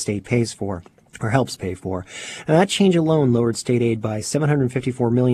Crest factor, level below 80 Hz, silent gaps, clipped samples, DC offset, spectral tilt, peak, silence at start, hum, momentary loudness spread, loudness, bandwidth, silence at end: 18 dB; -52 dBFS; none; under 0.1%; under 0.1%; -6 dB/octave; -2 dBFS; 0 s; none; 13 LU; -20 LUFS; 13.5 kHz; 0 s